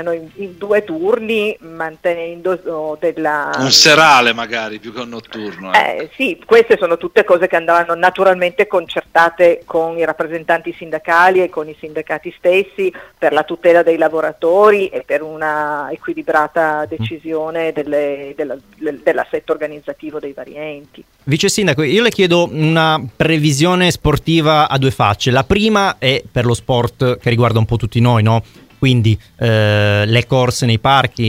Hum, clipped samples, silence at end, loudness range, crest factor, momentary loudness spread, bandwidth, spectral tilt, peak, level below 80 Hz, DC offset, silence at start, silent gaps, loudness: none; under 0.1%; 0 s; 7 LU; 14 dB; 13 LU; 16 kHz; -5 dB/octave; 0 dBFS; -40 dBFS; under 0.1%; 0 s; none; -14 LUFS